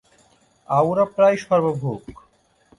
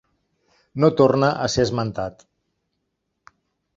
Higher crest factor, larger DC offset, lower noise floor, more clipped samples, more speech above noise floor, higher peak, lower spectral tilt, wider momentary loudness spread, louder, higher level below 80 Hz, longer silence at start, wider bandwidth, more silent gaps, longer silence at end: about the same, 16 dB vs 20 dB; neither; second, -58 dBFS vs -76 dBFS; neither; second, 39 dB vs 57 dB; about the same, -4 dBFS vs -2 dBFS; first, -7.5 dB/octave vs -6 dB/octave; second, 11 LU vs 15 LU; about the same, -20 LUFS vs -20 LUFS; second, -58 dBFS vs -52 dBFS; about the same, 0.7 s vs 0.75 s; first, 11.5 kHz vs 7.8 kHz; neither; second, 0.65 s vs 1.65 s